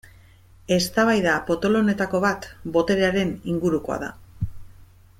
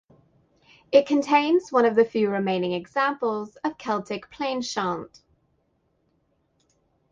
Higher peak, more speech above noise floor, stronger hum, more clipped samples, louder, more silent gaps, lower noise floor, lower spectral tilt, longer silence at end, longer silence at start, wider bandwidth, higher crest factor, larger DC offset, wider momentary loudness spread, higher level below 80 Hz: second, -8 dBFS vs -4 dBFS; second, 29 dB vs 46 dB; neither; neither; about the same, -22 LUFS vs -24 LUFS; neither; second, -50 dBFS vs -70 dBFS; about the same, -5.5 dB/octave vs -5 dB/octave; second, 0.35 s vs 2.05 s; second, 0.7 s vs 0.9 s; first, 16 kHz vs 7.6 kHz; second, 16 dB vs 22 dB; neither; first, 14 LU vs 11 LU; first, -46 dBFS vs -68 dBFS